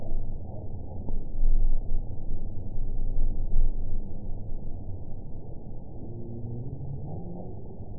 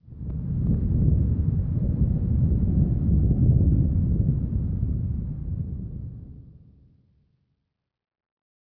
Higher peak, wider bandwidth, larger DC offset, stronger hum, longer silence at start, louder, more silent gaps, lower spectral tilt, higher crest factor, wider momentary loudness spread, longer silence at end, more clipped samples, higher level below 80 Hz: about the same, -10 dBFS vs -8 dBFS; second, 1 kHz vs 1.8 kHz; first, 1% vs under 0.1%; neither; about the same, 0 s vs 0.1 s; second, -37 LUFS vs -24 LUFS; neither; first, -16.5 dB/octave vs -15 dB/octave; about the same, 14 dB vs 16 dB; second, 10 LU vs 14 LU; second, 0 s vs 2.1 s; neither; about the same, -26 dBFS vs -30 dBFS